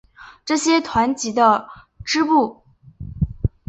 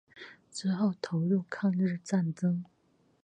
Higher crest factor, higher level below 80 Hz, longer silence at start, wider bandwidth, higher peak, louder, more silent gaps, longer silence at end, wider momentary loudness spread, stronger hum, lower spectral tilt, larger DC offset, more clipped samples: about the same, 18 dB vs 16 dB; first, -36 dBFS vs -76 dBFS; about the same, 0.2 s vs 0.15 s; second, 8.2 kHz vs 9.2 kHz; first, -2 dBFS vs -16 dBFS; first, -19 LUFS vs -31 LUFS; neither; second, 0.2 s vs 0.6 s; about the same, 18 LU vs 16 LU; neither; second, -4.5 dB/octave vs -7 dB/octave; neither; neither